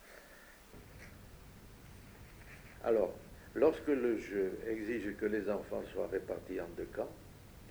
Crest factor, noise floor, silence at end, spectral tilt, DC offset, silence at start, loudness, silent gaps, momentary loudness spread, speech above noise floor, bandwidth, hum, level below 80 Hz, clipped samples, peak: 22 dB; -58 dBFS; 0 s; -6.5 dB/octave; under 0.1%; 0 s; -37 LUFS; none; 23 LU; 22 dB; over 20 kHz; none; -60 dBFS; under 0.1%; -16 dBFS